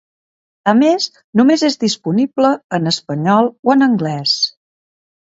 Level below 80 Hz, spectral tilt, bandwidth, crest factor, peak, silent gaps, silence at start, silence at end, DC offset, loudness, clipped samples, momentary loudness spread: -62 dBFS; -5 dB/octave; 8 kHz; 16 dB; 0 dBFS; 1.24-1.33 s, 2.64-2.70 s, 3.59-3.63 s; 0.65 s; 0.7 s; under 0.1%; -15 LUFS; under 0.1%; 6 LU